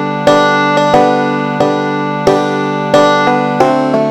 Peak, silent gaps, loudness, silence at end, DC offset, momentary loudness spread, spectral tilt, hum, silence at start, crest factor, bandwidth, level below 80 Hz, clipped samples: 0 dBFS; none; -11 LUFS; 0 s; under 0.1%; 5 LU; -5.5 dB/octave; none; 0 s; 10 dB; 15 kHz; -48 dBFS; 0.3%